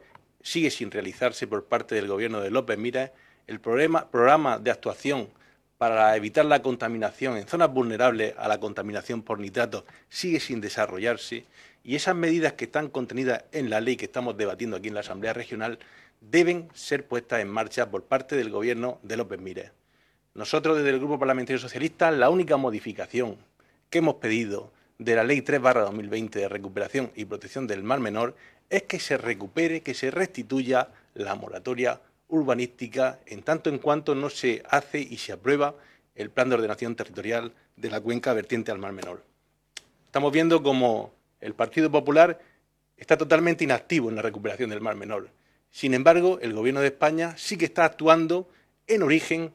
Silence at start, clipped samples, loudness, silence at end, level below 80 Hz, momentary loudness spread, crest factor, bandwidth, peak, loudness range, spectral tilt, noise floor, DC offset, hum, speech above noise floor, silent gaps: 0.45 s; under 0.1%; -26 LUFS; 0.05 s; -70 dBFS; 13 LU; 24 dB; 14 kHz; -2 dBFS; 6 LU; -5 dB/octave; -67 dBFS; under 0.1%; none; 41 dB; none